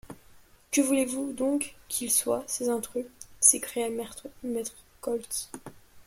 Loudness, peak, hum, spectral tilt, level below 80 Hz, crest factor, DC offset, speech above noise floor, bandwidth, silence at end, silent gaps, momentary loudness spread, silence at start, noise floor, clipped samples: -27 LUFS; -2 dBFS; none; -2 dB/octave; -62 dBFS; 28 dB; under 0.1%; 27 dB; 16.5 kHz; 0.05 s; none; 18 LU; 0.05 s; -56 dBFS; under 0.1%